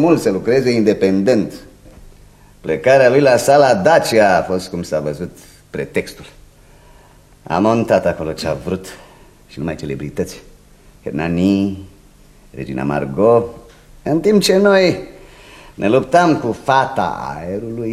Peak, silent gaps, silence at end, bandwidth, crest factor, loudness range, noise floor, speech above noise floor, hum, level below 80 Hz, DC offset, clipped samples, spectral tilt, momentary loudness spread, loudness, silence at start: 0 dBFS; none; 0 s; 15 kHz; 16 dB; 9 LU; -46 dBFS; 31 dB; none; -44 dBFS; under 0.1%; under 0.1%; -5.5 dB/octave; 16 LU; -15 LUFS; 0 s